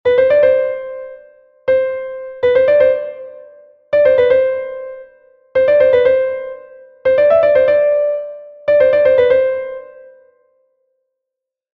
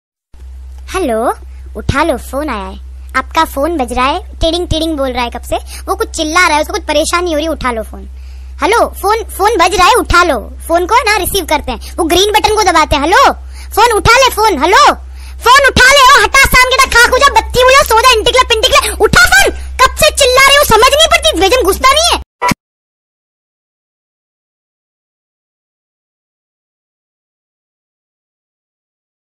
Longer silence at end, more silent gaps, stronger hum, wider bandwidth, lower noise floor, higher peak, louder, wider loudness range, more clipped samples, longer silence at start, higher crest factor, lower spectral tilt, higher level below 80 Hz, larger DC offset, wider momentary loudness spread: second, 1.7 s vs 6.8 s; second, none vs 22.26-22.39 s; neither; second, 4.6 kHz vs 16.5 kHz; first, -82 dBFS vs -31 dBFS; about the same, -2 dBFS vs 0 dBFS; second, -13 LUFS vs -9 LUFS; second, 3 LU vs 9 LU; neither; second, 0.05 s vs 0.4 s; about the same, 14 dB vs 10 dB; first, -6.5 dB/octave vs -2.5 dB/octave; second, -52 dBFS vs -26 dBFS; neither; first, 18 LU vs 13 LU